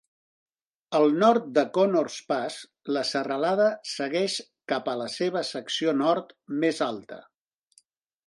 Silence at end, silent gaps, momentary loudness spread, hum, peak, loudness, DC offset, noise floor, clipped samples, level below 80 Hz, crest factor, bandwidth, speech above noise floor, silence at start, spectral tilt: 1.05 s; none; 11 LU; none; -8 dBFS; -26 LUFS; under 0.1%; -64 dBFS; under 0.1%; -78 dBFS; 20 dB; 11.5 kHz; 39 dB; 0.9 s; -4.5 dB/octave